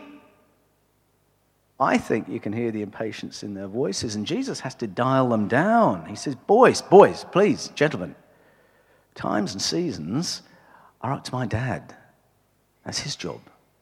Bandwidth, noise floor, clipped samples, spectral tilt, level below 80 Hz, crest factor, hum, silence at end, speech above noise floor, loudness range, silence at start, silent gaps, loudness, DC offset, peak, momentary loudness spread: 13.5 kHz; -66 dBFS; under 0.1%; -5 dB/octave; -60 dBFS; 24 dB; 50 Hz at -55 dBFS; 0.45 s; 43 dB; 11 LU; 0 s; none; -23 LUFS; under 0.1%; 0 dBFS; 17 LU